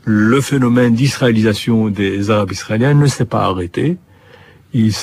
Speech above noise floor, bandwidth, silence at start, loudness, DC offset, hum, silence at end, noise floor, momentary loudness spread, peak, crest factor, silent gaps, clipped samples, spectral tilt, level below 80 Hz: 30 dB; 15.5 kHz; 0.05 s; -14 LUFS; under 0.1%; none; 0 s; -43 dBFS; 7 LU; -2 dBFS; 12 dB; none; under 0.1%; -6.5 dB/octave; -46 dBFS